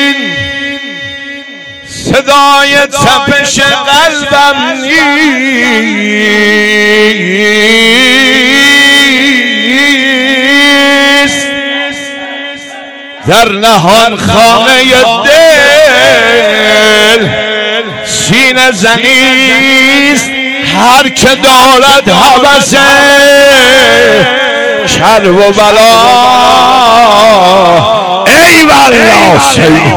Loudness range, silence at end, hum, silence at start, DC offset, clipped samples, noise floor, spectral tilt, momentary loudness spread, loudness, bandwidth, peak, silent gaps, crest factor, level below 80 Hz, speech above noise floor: 4 LU; 0 s; none; 0 s; 0.9%; 20%; -25 dBFS; -3 dB/octave; 10 LU; -4 LUFS; over 20 kHz; 0 dBFS; none; 4 dB; -36 dBFS; 21 dB